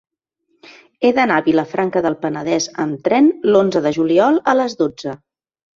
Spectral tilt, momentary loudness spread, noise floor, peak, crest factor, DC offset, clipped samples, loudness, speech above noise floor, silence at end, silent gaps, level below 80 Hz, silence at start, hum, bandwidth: -5 dB/octave; 8 LU; -67 dBFS; -2 dBFS; 16 dB; under 0.1%; under 0.1%; -16 LUFS; 51 dB; 0.6 s; none; -60 dBFS; 1 s; none; 7.6 kHz